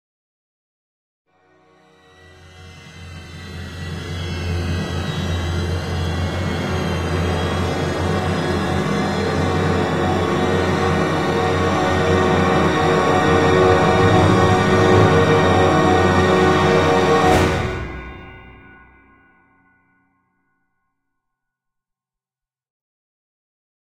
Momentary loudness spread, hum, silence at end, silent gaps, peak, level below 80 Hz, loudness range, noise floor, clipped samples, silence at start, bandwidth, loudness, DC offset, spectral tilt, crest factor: 14 LU; none; 5.35 s; none; -2 dBFS; -38 dBFS; 13 LU; under -90 dBFS; under 0.1%; 2.45 s; 14 kHz; -17 LUFS; under 0.1%; -6 dB/octave; 18 dB